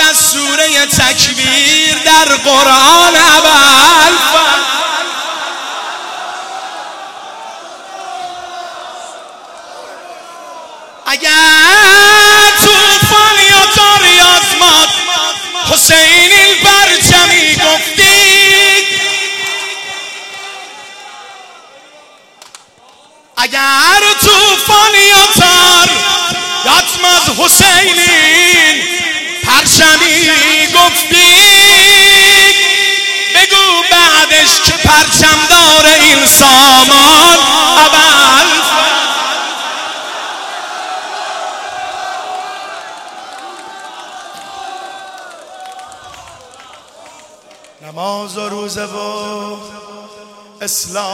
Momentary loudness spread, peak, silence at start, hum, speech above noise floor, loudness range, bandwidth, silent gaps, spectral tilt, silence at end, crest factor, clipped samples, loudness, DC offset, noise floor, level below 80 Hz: 20 LU; 0 dBFS; 0 s; none; 36 dB; 20 LU; over 20 kHz; none; -0.5 dB/octave; 0 s; 10 dB; 1%; -5 LUFS; under 0.1%; -43 dBFS; -38 dBFS